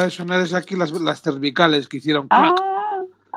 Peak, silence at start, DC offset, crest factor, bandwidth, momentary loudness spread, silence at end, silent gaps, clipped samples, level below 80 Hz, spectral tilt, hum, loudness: 0 dBFS; 0 s; under 0.1%; 20 dB; 12 kHz; 9 LU; 0 s; none; under 0.1%; -76 dBFS; -5.5 dB/octave; none; -19 LUFS